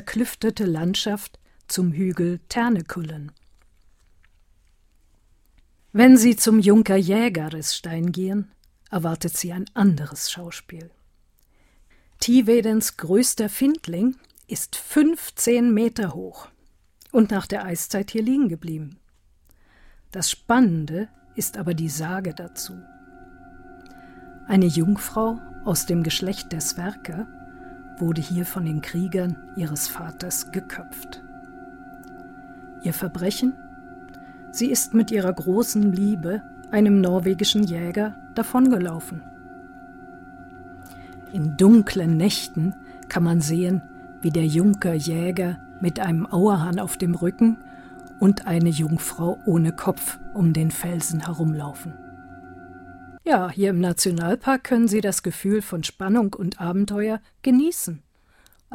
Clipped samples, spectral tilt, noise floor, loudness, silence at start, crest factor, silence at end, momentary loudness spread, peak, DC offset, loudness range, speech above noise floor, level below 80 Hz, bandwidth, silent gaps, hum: under 0.1%; -5.5 dB/octave; -59 dBFS; -22 LUFS; 0 s; 20 dB; 0 s; 24 LU; -2 dBFS; under 0.1%; 8 LU; 38 dB; -52 dBFS; 17 kHz; none; none